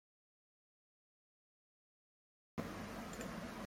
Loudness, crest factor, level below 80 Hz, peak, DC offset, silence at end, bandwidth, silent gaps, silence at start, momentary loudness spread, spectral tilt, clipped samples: -48 LUFS; 24 dB; -66 dBFS; -28 dBFS; under 0.1%; 0 s; 16 kHz; none; 2.55 s; 2 LU; -5 dB/octave; under 0.1%